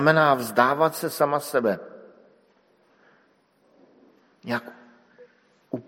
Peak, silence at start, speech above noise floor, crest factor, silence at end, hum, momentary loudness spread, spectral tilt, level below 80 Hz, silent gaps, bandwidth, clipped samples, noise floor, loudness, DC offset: -2 dBFS; 0 s; 41 dB; 24 dB; 0.05 s; 50 Hz at -65 dBFS; 20 LU; -5 dB/octave; -74 dBFS; none; 16.5 kHz; under 0.1%; -63 dBFS; -23 LUFS; under 0.1%